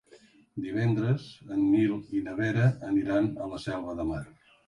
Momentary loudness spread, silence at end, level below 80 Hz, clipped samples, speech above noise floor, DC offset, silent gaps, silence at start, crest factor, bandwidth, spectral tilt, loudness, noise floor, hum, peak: 10 LU; 0.4 s; -54 dBFS; under 0.1%; 30 dB; under 0.1%; none; 0.15 s; 16 dB; 11 kHz; -8.5 dB/octave; -29 LUFS; -58 dBFS; none; -14 dBFS